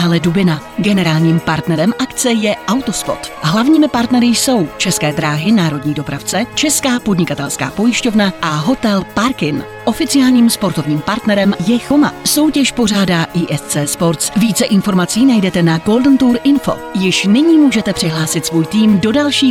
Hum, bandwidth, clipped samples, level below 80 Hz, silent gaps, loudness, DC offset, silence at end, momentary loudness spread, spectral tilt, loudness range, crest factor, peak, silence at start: none; 16.5 kHz; under 0.1%; -42 dBFS; none; -13 LUFS; under 0.1%; 0 s; 6 LU; -4.5 dB/octave; 3 LU; 10 dB; -2 dBFS; 0 s